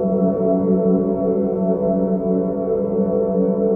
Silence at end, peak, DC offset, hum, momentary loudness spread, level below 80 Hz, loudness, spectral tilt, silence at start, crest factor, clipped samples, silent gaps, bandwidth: 0 s; -6 dBFS; under 0.1%; none; 3 LU; -46 dBFS; -19 LUFS; -14 dB/octave; 0 s; 12 dB; under 0.1%; none; 2.2 kHz